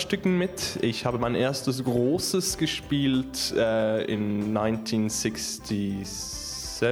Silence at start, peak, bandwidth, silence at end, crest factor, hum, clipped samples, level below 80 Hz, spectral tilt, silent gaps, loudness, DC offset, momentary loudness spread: 0 s; -10 dBFS; 19.5 kHz; 0 s; 16 dB; none; under 0.1%; -50 dBFS; -4.5 dB/octave; none; -27 LUFS; under 0.1%; 7 LU